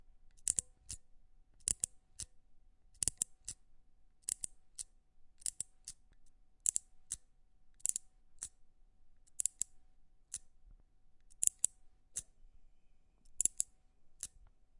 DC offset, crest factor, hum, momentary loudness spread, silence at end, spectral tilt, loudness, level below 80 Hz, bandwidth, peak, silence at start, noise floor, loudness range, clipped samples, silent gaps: under 0.1%; 38 dB; none; 15 LU; 0.5 s; 0.5 dB/octave; -39 LUFS; -64 dBFS; 11.5 kHz; -8 dBFS; 0.25 s; -64 dBFS; 5 LU; under 0.1%; none